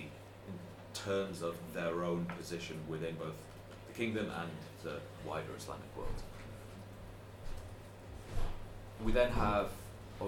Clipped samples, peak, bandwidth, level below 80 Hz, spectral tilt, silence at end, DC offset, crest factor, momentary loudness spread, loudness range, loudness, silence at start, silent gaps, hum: under 0.1%; -18 dBFS; 17.5 kHz; -46 dBFS; -5.5 dB/octave; 0 s; under 0.1%; 22 dB; 17 LU; 8 LU; -40 LUFS; 0 s; none; none